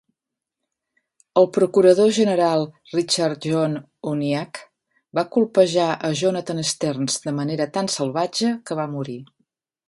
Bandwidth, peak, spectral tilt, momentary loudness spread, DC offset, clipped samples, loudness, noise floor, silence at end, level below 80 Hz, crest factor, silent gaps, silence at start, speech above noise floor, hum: 11.5 kHz; -2 dBFS; -5 dB/octave; 12 LU; under 0.1%; under 0.1%; -21 LUFS; -85 dBFS; 0.65 s; -68 dBFS; 18 dB; none; 1.35 s; 64 dB; none